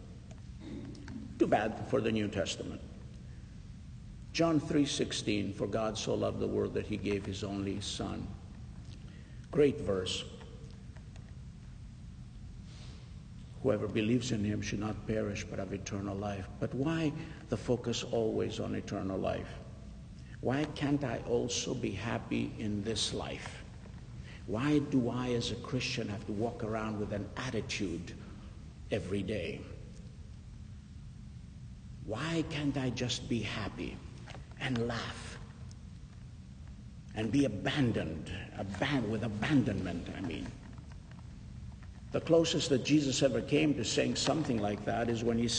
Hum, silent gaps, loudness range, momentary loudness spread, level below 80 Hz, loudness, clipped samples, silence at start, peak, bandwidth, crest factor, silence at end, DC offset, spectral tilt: none; none; 8 LU; 20 LU; -52 dBFS; -34 LUFS; under 0.1%; 0 s; -14 dBFS; 9.6 kHz; 20 dB; 0 s; under 0.1%; -5 dB/octave